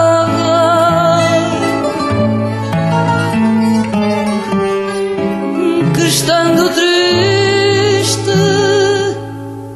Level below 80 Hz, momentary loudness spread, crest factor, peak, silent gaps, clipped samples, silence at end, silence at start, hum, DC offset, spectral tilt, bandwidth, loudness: -46 dBFS; 6 LU; 12 dB; 0 dBFS; none; under 0.1%; 0 s; 0 s; none; under 0.1%; -5 dB/octave; 14.5 kHz; -12 LUFS